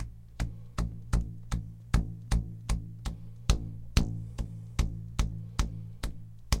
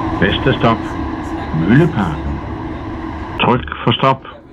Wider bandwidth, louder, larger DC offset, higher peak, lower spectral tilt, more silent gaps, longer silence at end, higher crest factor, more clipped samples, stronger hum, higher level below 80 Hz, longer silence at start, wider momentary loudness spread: first, 16 kHz vs 8.4 kHz; second, -35 LUFS vs -17 LUFS; neither; second, -8 dBFS vs 0 dBFS; second, -5 dB/octave vs -7.5 dB/octave; neither; about the same, 0 s vs 0 s; first, 26 dB vs 16 dB; neither; neither; about the same, -34 dBFS vs -30 dBFS; about the same, 0 s vs 0 s; second, 9 LU vs 13 LU